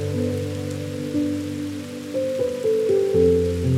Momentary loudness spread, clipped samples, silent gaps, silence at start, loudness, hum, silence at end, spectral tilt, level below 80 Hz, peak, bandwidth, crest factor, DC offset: 11 LU; under 0.1%; none; 0 s; -23 LUFS; none; 0 s; -7 dB/octave; -44 dBFS; -6 dBFS; 15.5 kHz; 16 dB; under 0.1%